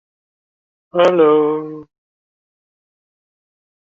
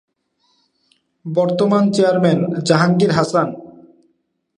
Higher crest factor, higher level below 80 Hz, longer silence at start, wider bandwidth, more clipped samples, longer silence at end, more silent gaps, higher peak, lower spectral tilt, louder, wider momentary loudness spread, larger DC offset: about the same, 18 dB vs 18 dB; second, -66 dBFS vs -58 dBFS; second, 0.95 s vs 1.25 s; second, 7.2 kHz vs 10.5 kHz; neither; first, 2.1 s vs 0.9 s; neither; about the same, -2 dBFS vs 0 dBFS; about the same, -6.5 dB/octave vs -6.5 dB/octave; about the same, -14 LUFS vs -16 LUFS; first, 13 LU vs 9 LU; neither